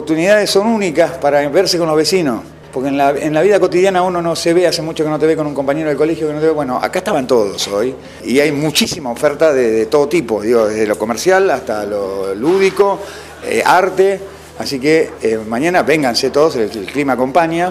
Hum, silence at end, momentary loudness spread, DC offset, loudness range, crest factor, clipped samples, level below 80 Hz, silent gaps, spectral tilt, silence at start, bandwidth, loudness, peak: none; 0 s; 8 LU; under 0.1%; 2 LU; 14 dB; under 0.1%; -46 dBFS; none; -4.5 dB/octave; 0 s; 16 kHz; -14 LUFS; 0 dBFS